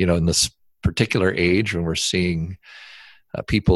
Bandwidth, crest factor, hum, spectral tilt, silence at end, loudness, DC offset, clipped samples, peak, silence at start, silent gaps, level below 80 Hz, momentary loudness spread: 13 kHz; 18 dB; none; -4.5 dB/octave; 0 s; -21 LUFS; under 0.1%; under 0.1%; -2 dBFS; 0 s; none; -34 dBFS; 20 LU